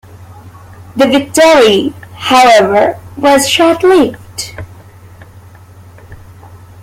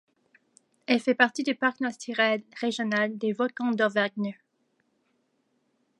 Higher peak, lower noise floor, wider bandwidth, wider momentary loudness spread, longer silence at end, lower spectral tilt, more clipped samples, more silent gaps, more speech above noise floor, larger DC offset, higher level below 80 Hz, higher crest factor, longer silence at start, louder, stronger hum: first, 0 dBFS vs -4 dBFS; second, -36 dBFS vs -73 dBFS; first, 16.5 kHz vs 11 kHz; first, 17 LU vs 9 LU; second, 0.25 s vs 1.65 s; about the same, -3.5 dB/octave vs -4.5 dB/octave; neither; neither; second, 28 dB vs 46 dB; neither; first, -44 dBFS vs -82 dBFS; second, 12 dB vs 24 dB; second, 0.3 s vs 0.9 s; first, -9 LUFS vs -27 LUFS; neither